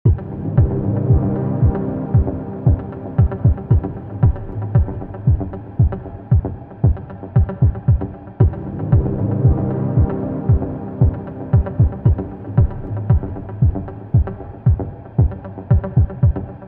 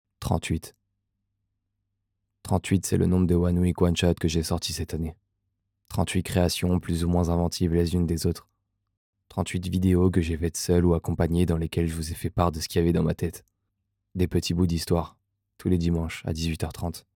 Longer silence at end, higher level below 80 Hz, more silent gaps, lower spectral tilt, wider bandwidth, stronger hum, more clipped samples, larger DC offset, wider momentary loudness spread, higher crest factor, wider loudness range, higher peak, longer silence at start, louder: second, 0 s vs 0.15 s; first, -24 dBFS vs -44 dBFS; second, none vs 8.97-9.13 s; first, -14 dB/octave vs -6 dB/octave; second, 2.9 kHz vs 17.5 kHz; neither; neither; first, 0.1% vs under 0.1%; second, 7 LU vs 10 LU; about the same, 16 dB vs 20 dB; about the same, 2 LU vs 3 LU; first, -2 dBFS vs -6 dBFS; second, 0.05 s vs 0.2 s; first, -19 LUFS vs -26 LUFS